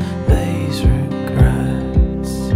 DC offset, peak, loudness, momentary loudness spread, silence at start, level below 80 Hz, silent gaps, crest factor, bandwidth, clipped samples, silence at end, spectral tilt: under 0.1%; 0 dBFS; -17 LUFS; 5 LU; 0 s; -20 dBFS; none; 16 dB; 15 kHz; under 0.1%; 0 s; -7.5 dB/octave